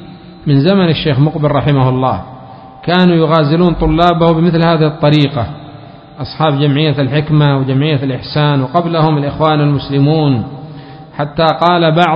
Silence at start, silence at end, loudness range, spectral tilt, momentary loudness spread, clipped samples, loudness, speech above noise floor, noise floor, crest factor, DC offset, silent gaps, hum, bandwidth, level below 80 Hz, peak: 0 s; 0 s; 2 LU; -9 dB/octave; 13 LU; under 0.1%; -12 LUFS; 22 dB; -33 dBFS; 12 dB; under 0.1%; none; none; 5.4 kHz; -34 dBFS; 0 dBFS